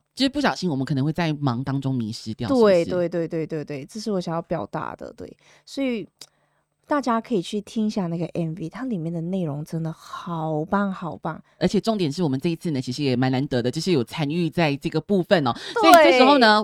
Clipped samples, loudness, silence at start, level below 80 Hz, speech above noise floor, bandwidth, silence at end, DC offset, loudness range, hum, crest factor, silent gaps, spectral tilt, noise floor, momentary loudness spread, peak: under 0.1%; -22 LUFS; 0.15 s; -56 dBFS; 46 dB; 20 kHz; 0 s; under 0.1%; 7 LU; none; 22 dB; none; -6 dB/octave; -68 dBFS; 14 LU; 0 dBFS